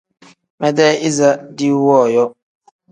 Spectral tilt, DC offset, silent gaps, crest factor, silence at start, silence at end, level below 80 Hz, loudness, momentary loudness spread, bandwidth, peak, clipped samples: -5 dB/octave; under 0.1%; none; 16 dB; 0.6 s; 0.6 s; -62 dBFS; -14 LUFS; 7 LU; 10.5 kHz; 0 dBFS; under 0.1%